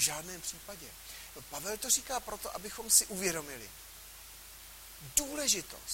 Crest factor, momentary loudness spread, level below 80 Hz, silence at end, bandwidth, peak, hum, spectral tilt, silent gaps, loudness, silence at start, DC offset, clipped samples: 26 dB; 23 LU; -58 dBFS; 0 s; 16.5 kHz; -10 dBFS; none; -0.5 dB/octave; none; -31 LUFS; 0 s; under 0.1%; under 0.1%